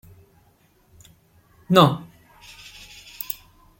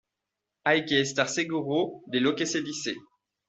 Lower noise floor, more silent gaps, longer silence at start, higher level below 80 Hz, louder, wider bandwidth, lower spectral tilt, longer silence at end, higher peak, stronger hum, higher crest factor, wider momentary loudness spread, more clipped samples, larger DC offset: second, -59 dBFS vs -86 dBFS; neither; first, 1.7 s vs 0.65 s; first, -58 dBFS vs -68 dBFS; first, -21 LUFS vs -27 LUFS; first, 16.5 kHz vs 8.2 kHz; first, -6 dB/octave vs -3.5 dB/octave; about the same, 0.45 s vs 0.45 s; first, -2 dBFS vs -8 dBFS; neither; about the same, 24 dB vs 20 dB; first, 26 LU vs 9 LU; neither; neither